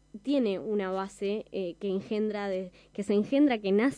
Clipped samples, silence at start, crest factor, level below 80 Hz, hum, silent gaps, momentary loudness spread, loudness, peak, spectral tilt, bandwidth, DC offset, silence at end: under 0.1%; 0.15 s; 14 dB; -66 dBFS; none; none; 10 LU; -30 LUFS; -16 dBFS; -6.5 dB/octave; 10.5 kHz; under 0.1%; 0 s